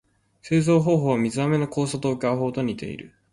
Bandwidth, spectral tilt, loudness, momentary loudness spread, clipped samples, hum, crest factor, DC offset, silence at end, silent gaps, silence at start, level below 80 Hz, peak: 11.5 kHz; -7 dB/octave; -23 LUFS; 11 LU; under 0.1%; none; 16 dB; under 0.1%; 0.25 s; none; 0.45 s; -58 dBFS; -8 dBFS